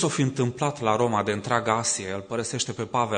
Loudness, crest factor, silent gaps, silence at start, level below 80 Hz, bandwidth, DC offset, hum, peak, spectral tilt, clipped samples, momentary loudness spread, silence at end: -25 LUFS; 20 dB; none; 0 s; -62 dBFS; 9.6 kHz; under 0.1%; none; -6 dBFS; -4 dB/octave; under 0.1%; 6 LU; 0 s